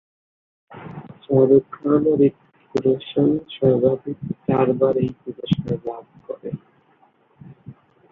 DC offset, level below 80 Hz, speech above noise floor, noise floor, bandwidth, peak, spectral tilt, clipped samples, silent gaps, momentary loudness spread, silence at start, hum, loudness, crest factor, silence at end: under 0.1%; -56 dBFS; 39 dB; -58 dBFS; 6.2 kHz; -4 dBFS; -9.5 dB/octave; under 0.1%; none; 20 LU; 0.7 s; none; -20 LUFS; 18 dB; 0.4 s